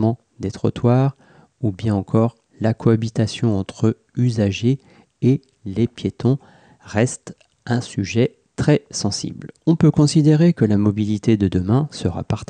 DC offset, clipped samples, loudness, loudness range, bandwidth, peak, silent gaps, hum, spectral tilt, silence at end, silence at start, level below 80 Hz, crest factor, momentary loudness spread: under 0.1%; under 0.1%; -20 LUFS; 5 LU; 9.8 kHz; -4 dBFS; none; none; -7 dB/octave; 0.05 s; 0 s; -50 dBFS; 16 dB; 10 LU